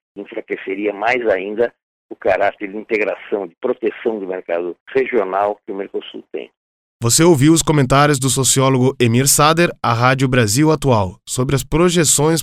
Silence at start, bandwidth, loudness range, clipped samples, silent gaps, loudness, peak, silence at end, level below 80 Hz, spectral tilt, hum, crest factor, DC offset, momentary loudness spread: 0.15 s; 16 kHz; 8 LU; under 0.1%; 1.83-2.09 s, 4.80-4.86 s, 6.57-7.00 s; -16 LUFS; 0 dBFS; 0 s; -40 dBFS; -4.5 dB/octave; none; 16 dB; under 0.1%; 14 LU